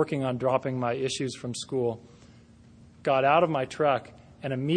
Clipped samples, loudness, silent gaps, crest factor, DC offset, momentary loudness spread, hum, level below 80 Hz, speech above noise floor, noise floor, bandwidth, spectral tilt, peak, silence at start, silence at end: under 0.1%; -27 LUFS; none; 20 dB; under 0.1%; 12 LU; none; -62 dBFS; 27 dB; -53 dBFS; 10 kHz; -5.5 dB/octave; -8 dBFS; 0 s; 0 s